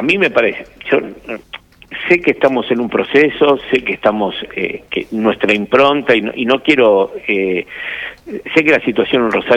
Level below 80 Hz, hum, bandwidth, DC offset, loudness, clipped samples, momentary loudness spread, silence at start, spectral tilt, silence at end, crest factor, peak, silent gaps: -50 dBFS; none; 10 kHz; under 0.1%; -14 LUFS; under 0.1%; 15 LU; 0 s; -6 dB/octave; 0 s; 14 dB; 0 dBFS; none